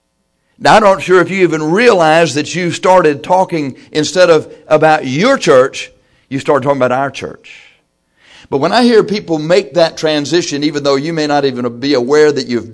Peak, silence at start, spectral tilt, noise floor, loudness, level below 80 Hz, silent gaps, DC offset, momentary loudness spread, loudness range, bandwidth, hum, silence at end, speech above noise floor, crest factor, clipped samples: 0 dBFS; 0.6 s; -5 dB/octave; -63 dBFS; -11 LUFS; -50 dBFS; none; under 0.1%; 9 LU; 4 LU; 11 kHz; none; 0 s; 51 dB; 12 dB; 0.3%